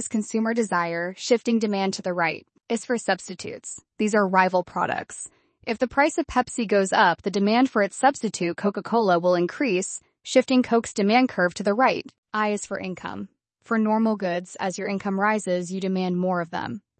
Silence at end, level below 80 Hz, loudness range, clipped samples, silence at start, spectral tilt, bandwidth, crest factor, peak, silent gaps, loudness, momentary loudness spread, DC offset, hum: 0.2 s; -60 dBFS; 4 LU; under 0.1%; 0 s; -4.5 dB/octave; 8.8 kHz; 18 dB; -6 dBFS; 12.18-12.23 s; -23 LUFS; 12 LU; under 0.1%; none